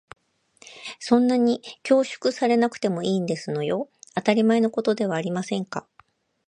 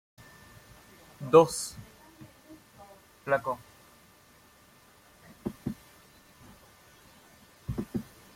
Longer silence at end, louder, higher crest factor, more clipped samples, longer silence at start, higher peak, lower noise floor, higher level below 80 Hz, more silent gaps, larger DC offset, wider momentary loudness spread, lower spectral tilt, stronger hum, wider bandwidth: first, 0.7 s vs 0.3 s; first, -23 LUFS vs -29 LUFS; second, 20 dB vs 28 dB; neither; second, 0.65 s vs 1.2 s; about the same, -4 dBFS vs -6 dBFS; about the same, -60 dBFS vs -59 dBFS; second, -70 dBFS vs -58 dBFS; neither; neither; second, 11 LU vs 31 LU; about the same, -6 dB/octave vs -5 dB/octave; neither; second, 10 kHz vs 16.5 kHz